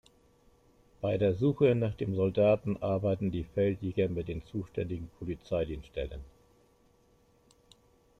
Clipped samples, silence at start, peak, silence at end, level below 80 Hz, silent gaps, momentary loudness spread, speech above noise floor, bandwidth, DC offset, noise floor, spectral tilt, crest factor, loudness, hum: under 0.1%; 1 s; -14 dBFS; 1.9 s; -52 dBFS; none; 12 LU; 35 dB; 8.6 kHz; under 0.1%; -66 dBFS; -9 dB/octave; 18 dB; -31 LUFS; none